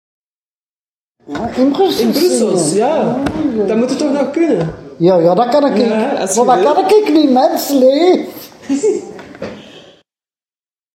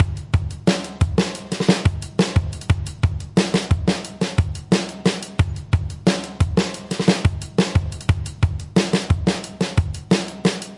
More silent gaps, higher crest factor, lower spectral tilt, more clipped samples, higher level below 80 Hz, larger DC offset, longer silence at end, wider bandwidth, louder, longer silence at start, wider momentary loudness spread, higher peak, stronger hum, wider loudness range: neither; about the same, 14 dB vs 18 dB; about the same, -5 dB/octave vs -6 dB/octave; neither; second, -50 dBFS vs -34 dBFS; neither; first, 1.15 s vs 0 s; first, 16.5 kHz vs 11.5 kHz; first, -13 LUFS vs -21 LUFS; first, 1.3 s vs 0 s; first, 13 LU vs 4 LU; about the same, 0 dBFS vs -2 dBFS; neither; first, 4 LU vs 1 LU